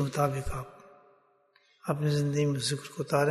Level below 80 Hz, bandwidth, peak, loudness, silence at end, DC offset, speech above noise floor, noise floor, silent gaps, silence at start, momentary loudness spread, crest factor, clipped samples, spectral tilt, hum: -50 dBFS; 12.5 kHz; -12 dBFS; -30 LUFS; 0 s; under 0.1%; 38 dB; -66 dBFS; none; 0 s; 12 LU; 20 dB; under 0.1%; -5.5 dB/octave; none